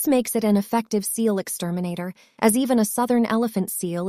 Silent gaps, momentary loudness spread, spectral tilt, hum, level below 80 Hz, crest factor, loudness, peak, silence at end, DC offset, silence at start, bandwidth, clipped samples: none; 7 LU; -5 dB/octave; none; -64 dBFS; 16 dB; -22 LUFS; -6 dBFS; 0 s; under 0.1%; 0 s; 16 kHz; under 0.1%